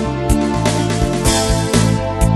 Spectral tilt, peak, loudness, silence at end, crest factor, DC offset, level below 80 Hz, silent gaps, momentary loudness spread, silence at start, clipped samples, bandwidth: -5 dB/octave; 0 dBFS; -16 LUFS; 0 s; 14 dB; under 0.1%; -22 dBFS; none; 2 LU; 0 s; under 0.1%; 13 kHz